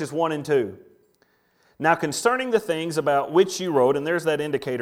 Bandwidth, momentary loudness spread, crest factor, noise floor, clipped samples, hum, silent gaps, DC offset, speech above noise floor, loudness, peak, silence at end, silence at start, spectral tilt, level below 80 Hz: 16.5 kHz; 5 LU; 20 dB; -64 dBFS; under 0.1%; none; none; under 0.1%; 42 dB; -23 LUFS; -4 dBFS; 0 s; 0 s; -4.5 dB/octave; -66 dBFS